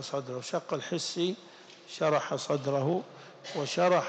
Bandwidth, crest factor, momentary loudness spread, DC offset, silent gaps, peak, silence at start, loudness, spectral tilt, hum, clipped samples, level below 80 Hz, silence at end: 9 kHz; 18 dB; 17 LU; under 0.1%; none; -14 dBFS; 0 s; -31 LUFS; -4.5 dB/octave; none; under 0.1%; -86 dBFS; 0 s